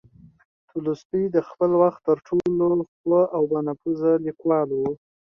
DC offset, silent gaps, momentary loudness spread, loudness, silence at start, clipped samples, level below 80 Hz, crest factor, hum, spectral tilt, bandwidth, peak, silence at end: under 0.1%; 1.05-1.10 s, 2.88-3.04 s; 8 LU; -23 LUFS; 0.75 s; under 0.1%; -62 dBFS; 16 dB; none; -10 dB/octave; 6.6 kHz; -6 dBFS; 0.45 s